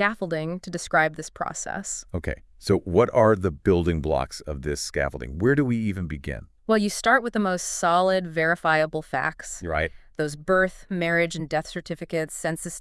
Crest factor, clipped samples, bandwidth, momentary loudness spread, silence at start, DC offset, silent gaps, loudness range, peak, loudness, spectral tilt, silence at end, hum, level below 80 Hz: 18 dB; under 0.1%; 12 kHz; 11 LU; 0 s; under 0.1%; none; 3 LU; -6 dBFS; -25 LUFS; -5 dB/octave; 0 s; none; -44 dBFS